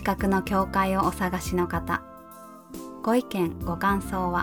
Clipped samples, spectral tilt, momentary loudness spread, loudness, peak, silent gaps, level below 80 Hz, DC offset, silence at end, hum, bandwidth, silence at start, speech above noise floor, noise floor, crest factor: under 0.1%; -6 dB/octave; 18 LU; -26 LUFS; -10 dBFS; none; -42 dBFS; under 0.1%; 0 s; none; 19 kHz; 0 s; 20 dB; -46 dBFS; 16 dB